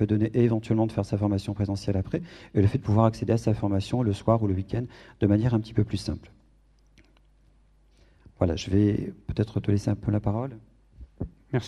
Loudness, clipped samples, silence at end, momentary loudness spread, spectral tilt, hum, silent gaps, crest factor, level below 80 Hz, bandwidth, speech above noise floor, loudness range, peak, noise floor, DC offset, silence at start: -26 LUFS; under 0.1%; 0 s; 10 LU; -8 dB/octave; none; none; 20 dB; -46 dBFS; 10 kHz; 35 dB; 5 LU; -6 dBFS; -60 dBFS; under 0.1%; 0 s